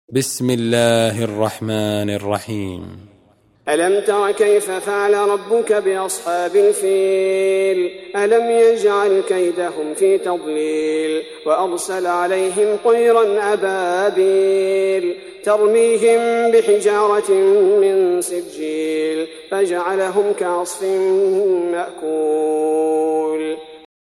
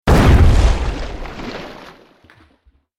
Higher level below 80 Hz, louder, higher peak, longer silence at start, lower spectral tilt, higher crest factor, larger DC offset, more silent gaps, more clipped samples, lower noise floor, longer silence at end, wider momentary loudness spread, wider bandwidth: second, -62 dBFS vs -18 dBFS; second, -17 LUFS vs -14 LUFS; about the same, -2 dBFS vs -2 dBFS; about the same, 0.1 s vs 0.05 s; second, -4.5 dB/octave vs -6.5 dB/octave; about the same, 16 dB vs 14 dB; neither; neither; neither; about the same, -54 dBFS vs -56 dBFS; second, 0.25 s vs 1.1 s; second, 9 LU vs 21 LU; about the same, 15 kHz vs 15.5 kHz